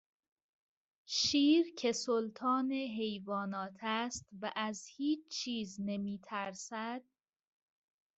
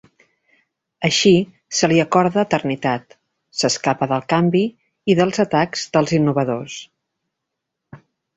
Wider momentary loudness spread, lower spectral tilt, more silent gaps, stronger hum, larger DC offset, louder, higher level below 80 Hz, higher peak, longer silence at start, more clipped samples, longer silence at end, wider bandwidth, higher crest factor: about the same, 12 LU vs 11 LU; second, -3.5 dB/octave vs -5 dB/octave; neither; neither; neither; second, -36 LUFS vs -18 LUFS; second, -76 dBFS vs -58 dBFS; second, -20 dBFS vs -2 dBFS; about the same, 1.1 s vs 1 s; neither; first, 1.15 s vs 0.4 s; about the same, 8.2 kHz vs 8.4 kHz; about the same, 18 dB vs 18 dB